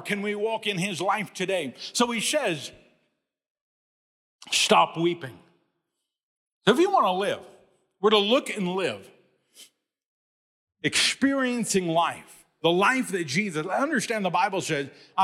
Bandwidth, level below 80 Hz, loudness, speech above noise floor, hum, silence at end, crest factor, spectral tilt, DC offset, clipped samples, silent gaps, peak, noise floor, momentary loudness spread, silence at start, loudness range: 16.5 kHz; -70 dBFS; -25 LUFS; 57 dB; none; 0 s; 20 dB; -3.5 dB/octave; under 0.1%; under 0.1%; 3.50-3.55 s, 3.61-4.39 s, 6.23-6.61 s, 10.06-10.67 s; -6 dBFS; -82 dBFS; 10 LU; 0 s; 3 LU